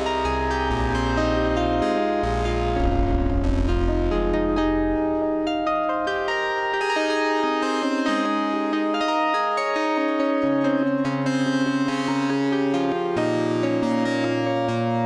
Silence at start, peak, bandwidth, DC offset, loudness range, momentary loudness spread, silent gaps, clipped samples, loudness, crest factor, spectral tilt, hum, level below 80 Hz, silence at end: 0 s; -10 dBFS; 10.5 kHz; under 0.1%; 1 LU; 2 LU; none; under 0.1%; -23 LUFS; 12 dB; -6 dB/octave; none; -32 dBFS; 0 s